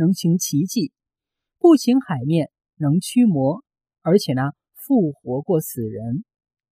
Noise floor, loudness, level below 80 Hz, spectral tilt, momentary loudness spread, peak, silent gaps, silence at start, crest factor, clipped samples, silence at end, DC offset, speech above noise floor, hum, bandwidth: -85 dBFS; -20 LUFS; -64 dBFS; -6.5 dB/octave; 13 LU; -2 dBFS; none; 0 s; 18 dB; under 0.1%; 0.5 s; under 0.1%; 67 dB; none; 16 kHz